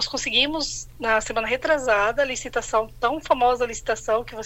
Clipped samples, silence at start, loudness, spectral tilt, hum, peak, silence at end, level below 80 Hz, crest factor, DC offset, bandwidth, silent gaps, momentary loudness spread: under 0.1%; 0 s; -23 LUFS; -2 dB/octave; none; -4 dBFS; 0 s; -44 dBFS; 18 dB; under 0.1%; 16 kHz; none; 7 LU